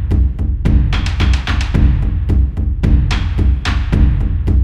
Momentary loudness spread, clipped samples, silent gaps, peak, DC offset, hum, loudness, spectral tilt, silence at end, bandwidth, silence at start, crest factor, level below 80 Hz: 3 LU; under 0.1%; none; 0 dBFS; 2%; none; -16 LUFS; -7 dB/octave; 0 s; 8.4 kHz; 0 s; 12 dB; -14 dBFS